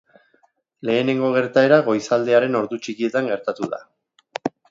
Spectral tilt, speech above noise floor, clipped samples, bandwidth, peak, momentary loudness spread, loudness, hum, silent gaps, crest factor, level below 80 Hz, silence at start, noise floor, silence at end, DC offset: -6 dB/octave; 43 dB; under 0.1%; 7.8 kHz; 0 dBFS; 14 LU; -20 LUFS; none; none; 20 dB; -70 dBFS; 0.85 s; -62 dBFS; 0.2 s; under 0.1%